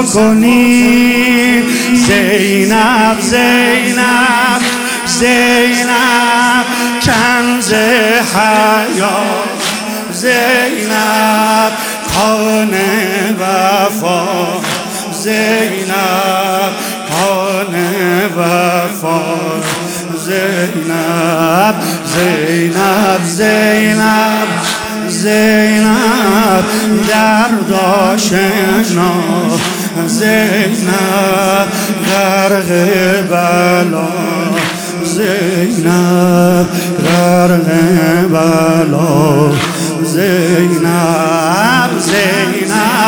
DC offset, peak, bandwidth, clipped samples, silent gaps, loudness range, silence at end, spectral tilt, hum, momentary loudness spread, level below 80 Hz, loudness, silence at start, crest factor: under 0.1%; 0 dBFS; 18 kHz; under 0.1%; none; 4 LU; 0 s; -4.5 dB/octave; none; 6 LU; -44 dBFS; -10 LUFS; 0 s; 10 dB